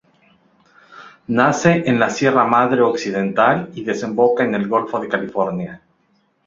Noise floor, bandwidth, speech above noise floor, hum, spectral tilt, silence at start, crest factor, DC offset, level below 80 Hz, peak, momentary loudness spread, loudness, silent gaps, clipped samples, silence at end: -62 dBFS; 7.8 kHz; 45 dB; none; -6 dB/octave; 0.9 s; 18 dB; under 0.1%; -58 dBFS; 0 dBFS; 9 LU; -17 LUFS; none; under 0.1%; 0.7 s